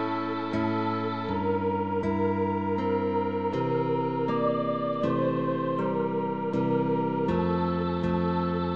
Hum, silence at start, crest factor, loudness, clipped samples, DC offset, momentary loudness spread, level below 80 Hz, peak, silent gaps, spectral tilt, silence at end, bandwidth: none; 0 s; 14 dB; -28 LUFS; under 0.1%; 0.3%; 3 LU; -54 dBFS; -14 dBFS; none; -9 dB/octave; 0 s; 7 kHz